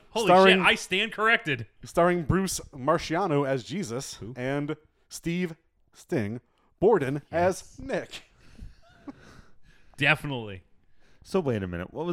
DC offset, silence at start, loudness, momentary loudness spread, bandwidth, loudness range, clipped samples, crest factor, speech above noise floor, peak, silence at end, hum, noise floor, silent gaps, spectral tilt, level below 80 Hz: under 0.1%; 0.15 s; -26 LUFS; 16 LU; 16.5 kHz; 8 LU; under 0.1%; 22 dB; 29 dB; -4 dBFS; 0 s; none; -55 dBFS; none; -4.5 dB/octave; -52 dBFS